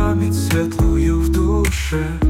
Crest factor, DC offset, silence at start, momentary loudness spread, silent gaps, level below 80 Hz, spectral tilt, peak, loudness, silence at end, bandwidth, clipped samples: 10 dB; under 0.1%; 0 s; 3 LU; none; -22 dBFS; -6.5 dB/octave; -6 dBFS; -18 LUFS; 0 s; 16.5 kHz; under 0.1%